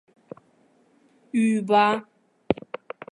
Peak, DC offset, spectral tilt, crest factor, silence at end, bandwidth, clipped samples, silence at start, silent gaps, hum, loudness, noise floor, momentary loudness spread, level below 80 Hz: -2 dBFS; under 0.1%; -6 dB/octave; 24 dB; 0.6 s; 10.5 kHz; under 0.1%; 1.35 s; none; none; -23 LUFS; -61 dBFS; 14 LU; -62 dBFS